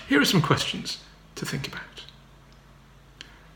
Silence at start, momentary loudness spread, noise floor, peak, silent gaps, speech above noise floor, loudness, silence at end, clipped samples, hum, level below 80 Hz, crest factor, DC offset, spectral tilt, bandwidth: 0 s; 26 LU; -52 dBFS; -4 dBFS; none; 27 dB; -25 LUFS; 0.2 s; under 0.1%; none; -54 dBFS; 24 dB; under 0.1%; -4.5 dB/octave; 19 kHz